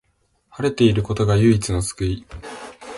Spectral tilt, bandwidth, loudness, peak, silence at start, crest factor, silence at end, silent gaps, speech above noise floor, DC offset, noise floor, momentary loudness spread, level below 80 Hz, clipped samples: -6 dB/octave; 11.5 kHz; -19 LUFS; -4 dBFS; 0.55 s; 16 dB; 0 s; none; 47 dB; under 0.1%; -65 dBFS; 19 LU; -38 dBFS; under 0.1%